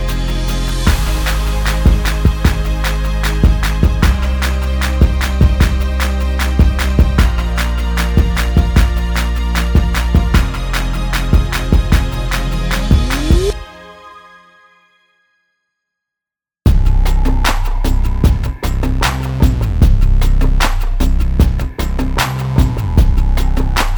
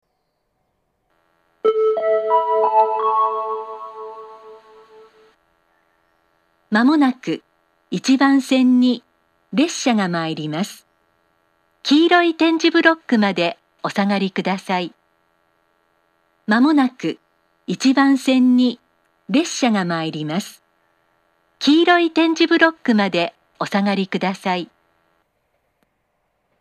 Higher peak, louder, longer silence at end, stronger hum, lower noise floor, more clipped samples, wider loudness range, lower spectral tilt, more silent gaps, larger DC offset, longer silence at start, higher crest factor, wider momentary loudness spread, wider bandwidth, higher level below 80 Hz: about the same, 0 dBFS vs 0 dBFS; first, -15 LUFS vs -18 LUFS; second, 0 s vs 1.95 s; neither; first, -87 dBFS vs -71 dBFS; neither; about the same, 5 LU vs 6 LU; about the same, -5.5 dB/octave vs -5 dB/octave; neither; neither; second, 0 s vs 1.65 s; second, 12 dB vs 20 dB; second, 5 LU vs 14 LU; first, over 20 kHz vs 13 kHz; first, -14 dBFS vs -78 dBFS